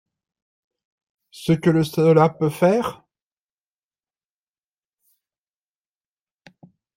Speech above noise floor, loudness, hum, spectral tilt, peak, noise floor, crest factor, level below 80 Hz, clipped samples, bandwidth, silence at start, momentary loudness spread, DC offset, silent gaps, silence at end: over 72 dB; -19 LUFS; none; -7.5 dB/octave; -2 dBFS; under -90 dBFS; 22 dB; -60 dBFS; under 0.1%; 16 kHz; 1.4 s; 10 LU; under 0.1%; none; 4.05 s